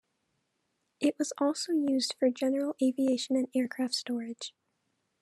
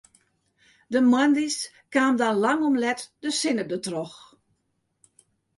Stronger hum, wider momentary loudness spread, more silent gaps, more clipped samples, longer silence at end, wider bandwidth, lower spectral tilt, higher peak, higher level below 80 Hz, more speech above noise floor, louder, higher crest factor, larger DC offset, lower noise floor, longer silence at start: neither; about the same, 8 LU vs 10 LU; neither; neither; second, 0.75 s vs 1.4 s; first, 13 kHz vs 11.5 kHz; about the same, -3 dB/octave vs -3.5 dB/octave; second, -16 dBFS vs -8 dBFS; second, under -90 dBFS vs -72 dBFS; about the same, 49 dB vs 51 dB; second, -30 LUFS vs -24 LUFS; about the same, 16 dB vs 18 dB; neither; first, -79 dBFS vs -74 dBFS; about the same, 1 s vs 0.9 s